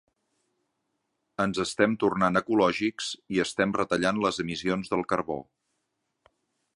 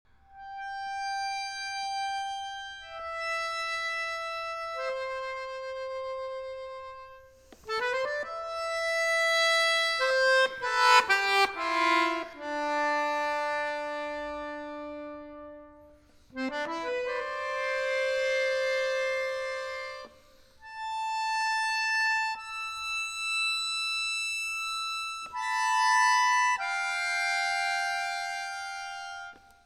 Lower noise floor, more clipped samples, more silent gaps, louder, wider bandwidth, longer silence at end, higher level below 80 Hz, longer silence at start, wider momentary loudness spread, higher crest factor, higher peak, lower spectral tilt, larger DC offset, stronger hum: first, -79 dBFS vs -57 dBFS; neither; neither; about the same, -27 LUFS vs -28 LUFS; second, 11.5 kHz vs 17 kHz; first, 1.3 s vs 0.3 s; about the same, -60 dBFS vs -64 dBFS; first, 1.4 s vs 0.3 s; second, 7 LU vs 16 LU; about the same, 22 dB vs 22 dB; about the same, -6 dBFS vs -8 dBFS; first, -5 dB/octave vs 0 dB/octave; neither; neither